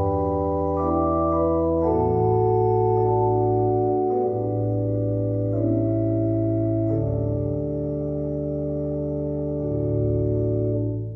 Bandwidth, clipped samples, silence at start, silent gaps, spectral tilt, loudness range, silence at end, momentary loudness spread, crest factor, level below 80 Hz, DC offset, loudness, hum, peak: 2.3 kHz; under 0.1%; 0 s; none; -13.5 dB/octave; 5 LU; 0 s; 6 LU; 14 dB; -38 dBFS; under 0.1%; -23 LUFS; none; -8 dBFS